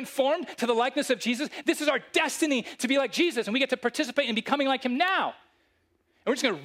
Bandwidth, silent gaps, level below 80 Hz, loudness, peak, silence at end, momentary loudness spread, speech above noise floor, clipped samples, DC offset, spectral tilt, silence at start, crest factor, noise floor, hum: 16 kHz; none; -78 dBFS; -27 LUFS; -10 dBFS; 0 s; 4 LU; 43 dB; under 0.1%; under 0.1%; -2.5 dB/octave; 0 s; 18 dB; -70 dBFS; none